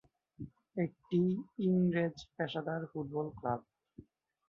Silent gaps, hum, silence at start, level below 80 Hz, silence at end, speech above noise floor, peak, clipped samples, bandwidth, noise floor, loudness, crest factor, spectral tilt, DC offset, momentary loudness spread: none; none; 0.4 s; -68 dBFS; 0.5 s; 25 dB; -20 dBFS; under 0.1%; 6.8 kHz; -59 dBFS; -36 LUFS; 16 dB; -8.5 dB/octave; under 0.1%; 12 LU